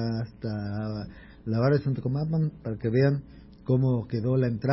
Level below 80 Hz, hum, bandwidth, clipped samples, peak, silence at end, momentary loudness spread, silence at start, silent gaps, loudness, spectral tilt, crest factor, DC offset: -52 dBFS; none; 5.8 kHz; under 0.1%; -12 dBFS; 0 s; 10 LU; 0 s; none; -28 LUFS; -12.5 dB/octave; 16 dB; under 0.1%